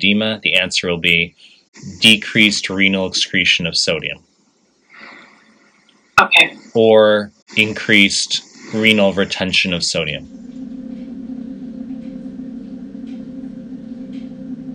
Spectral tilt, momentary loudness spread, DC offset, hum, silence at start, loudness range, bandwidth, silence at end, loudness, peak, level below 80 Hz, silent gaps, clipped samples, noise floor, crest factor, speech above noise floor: -3 dB/octave; 21 LU; under 0.1%; none; 0 s; 17 LU; 17.5 kHz; 0 s; -14 LUFS; 0 dBFS; -54 dBFS; 1.68-1.73 s, 7.42-7.46 s; under 0.1%; -58 dBFS; 18 dB; 43 dB